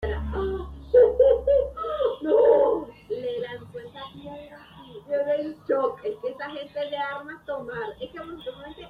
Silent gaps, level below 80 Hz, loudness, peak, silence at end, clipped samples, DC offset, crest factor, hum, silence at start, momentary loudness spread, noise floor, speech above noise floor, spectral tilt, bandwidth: none; -44 dBFS; -25 LUFS; -8 dBFS; 0 s; under 0.1%; under 0.1%; 18 dB; none; 0 s; 21 LU; -46 dBFS; 13 dB; -8 dB/octave; 5 kHz